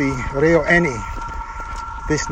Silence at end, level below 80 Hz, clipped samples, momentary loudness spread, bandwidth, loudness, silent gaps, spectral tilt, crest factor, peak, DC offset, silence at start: 0 s; -32 dBFS; under 0.1%; 15 LU; 10 kHz; -19 LUFS; none; -5.5 dB/octave; 18 dB; -2 dBFS; under 0.1%; 0 s